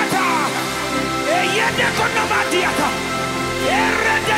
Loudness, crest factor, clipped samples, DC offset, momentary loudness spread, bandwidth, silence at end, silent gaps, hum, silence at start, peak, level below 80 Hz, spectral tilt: -18 LUFS; 14 dB; under 0.1%; under 0.1%; 5 LU; 16 kHz; 0 s; none; none; 0 s; -4 dBFS; -44 dBFS; -3 dB/octave